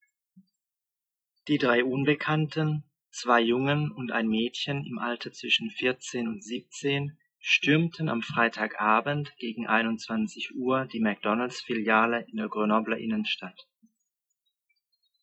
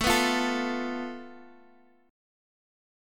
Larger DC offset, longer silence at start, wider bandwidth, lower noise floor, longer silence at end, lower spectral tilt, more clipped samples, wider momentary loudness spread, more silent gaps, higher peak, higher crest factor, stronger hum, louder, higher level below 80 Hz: neither; first, 0.35 s vs 0 s; second, 8.4 kHz vs 17.5 kHz; first, -90 dBFS vs -60 dBFS; first, 1.6 s vs 1 s; first, -5.5 dB/octave vs -2.5 dB/octave; neither; second, 10 LU vs 20 LU; neither; about the same, -8 dBFS vs -10 dBFS; about the same, 20 dB vs 22 dB; neither; about the same, -27 LUFS vs -28 LUFS; second, -72 dBFS vs -50 dBFS